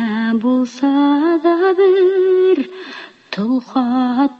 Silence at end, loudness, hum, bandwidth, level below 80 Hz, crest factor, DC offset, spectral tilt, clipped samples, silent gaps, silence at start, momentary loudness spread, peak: 0.05 s; -15 LUFS; none; 7 kHz; -64 dBFS; 12 dB; under 0.1%; -6.5 dB/octave; under 0.1%; none; 0 s; 14 LU; -4 dBFS